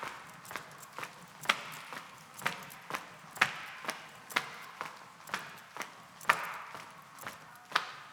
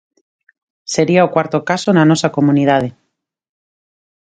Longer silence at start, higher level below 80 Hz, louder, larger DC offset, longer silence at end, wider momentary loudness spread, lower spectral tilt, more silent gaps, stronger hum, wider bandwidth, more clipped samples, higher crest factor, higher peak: second, 0 s vs 0.9 s; second, -78 dBFS vs -58 dBFS; second, -37 LUFS vs -14 LUFS; neither; second, 0 s vs 1.45 s; first, 16 LU vs 9 LU; second, -1.5 dB/octave vs -6 dB/octave; neither; neither; first, over 20 kHz vs 9.4 kHz; neither; first, 34 dB vs 16 dB; second, -6 dBFS vs 0 dBFS